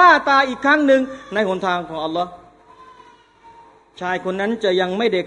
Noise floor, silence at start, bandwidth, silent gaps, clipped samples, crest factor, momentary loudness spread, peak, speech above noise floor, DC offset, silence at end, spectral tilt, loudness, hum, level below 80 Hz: -48 dBFS; 0 s; 10.5 kHz; none; under 0.1%; 18 dB; 11 LU; 0 dBFS; 29 dB; under 0.1%; 0 s; -5 dB/octave; -18 LUFS; none; -58 dBFS